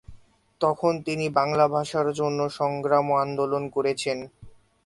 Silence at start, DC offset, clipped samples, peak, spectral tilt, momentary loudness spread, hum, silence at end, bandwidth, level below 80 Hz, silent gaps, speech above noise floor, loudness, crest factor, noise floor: 0.1 s; under 0.1%; under 0.1%; -6 dBFS; -5.5 dB/octave; 6 LU; none; 0.35 s; 11.5 kHz; -60 dBFS; none; 25 dB; -25 LUFS; 20 dB; -50 dBFS